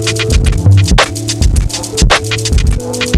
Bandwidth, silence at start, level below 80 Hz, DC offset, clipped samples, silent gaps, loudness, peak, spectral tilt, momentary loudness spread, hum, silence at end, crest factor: 14 kHz; 0 s; -14 dBFS; under 0.1%; under 0.1%; none; -11 LUFS; 0 dBFS; -4 dB/octave; 6 LU; none; 0 s; 10 dB